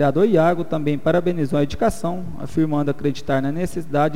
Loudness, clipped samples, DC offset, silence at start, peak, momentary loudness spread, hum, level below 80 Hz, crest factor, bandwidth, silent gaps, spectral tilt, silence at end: -21 LUFS; under 0.1%; 4%; 0 s; -6 dBFS; 10 LU; none; -44 dBFS; 14 dB; 16 kHz; none; -7.5 dB/octave; 0 s